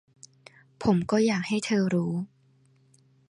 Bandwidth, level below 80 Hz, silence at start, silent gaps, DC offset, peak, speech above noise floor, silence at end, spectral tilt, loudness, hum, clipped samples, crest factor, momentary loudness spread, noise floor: 11 kHz; -60 dBFS; 0.8 s; none; under 0.1%; -10 dBFS; 37 dB; 1.05 s; -6 dB/octave; -26 LUFS; none; under 0.1%; 18 dB; 9 LU; -62 dBFS